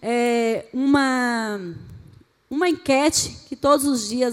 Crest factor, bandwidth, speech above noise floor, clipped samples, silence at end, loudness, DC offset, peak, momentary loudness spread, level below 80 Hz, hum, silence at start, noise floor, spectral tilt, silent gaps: 16 dB; 16.5 kHz; 29 dB; under 0.1%; 0 s; -21 LUFS; under 0.1%; -4 dBFS; 11 LU; -54 dBFS; none; 0 s; -50 dBFS; -3 dB/octave; none